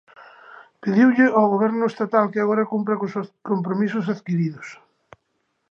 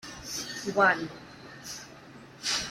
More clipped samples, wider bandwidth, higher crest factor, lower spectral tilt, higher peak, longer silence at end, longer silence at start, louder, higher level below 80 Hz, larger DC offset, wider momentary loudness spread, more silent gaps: neither; second, 7.2 kHz vs 16 kHz; about the same, 18 dB vs 22 dB; first, -8.5 dB/octave vs -2 dB/octave; first, -4 dBFS vs -8 dBFS; first, 0.95 s vs 0 s; first, 0.2 s vs 0.05 s; first, -21 LUFS vs -28 LUFS; second, -74 dBFS vs -62 dBFS; neither; second, 12 LU vs 23 LU; neither